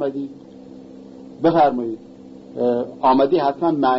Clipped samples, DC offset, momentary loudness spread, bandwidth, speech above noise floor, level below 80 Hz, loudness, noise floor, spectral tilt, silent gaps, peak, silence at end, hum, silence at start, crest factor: under 0.1%; under 0.1%; 24 LU; 6 kHz; 21 dB; -60 dBFS; -19 LUFS; -40 dBFS; -8.5 dB/octave; none; -6 dBFS; 0 s; none; 0 s; 14 dB